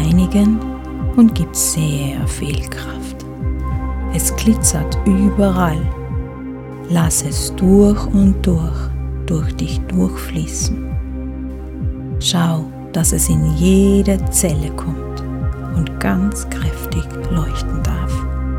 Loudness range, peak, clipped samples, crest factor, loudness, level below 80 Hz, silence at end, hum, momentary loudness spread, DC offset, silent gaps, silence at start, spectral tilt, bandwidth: 5 LU; 0 dBFS; under 0.1%; 16 dB; -17 LUFS; -24 dBFS; 0 s; none; 12 LU; under 0.1%; none; 0 s; -5.5 dB/octave; 17 kHz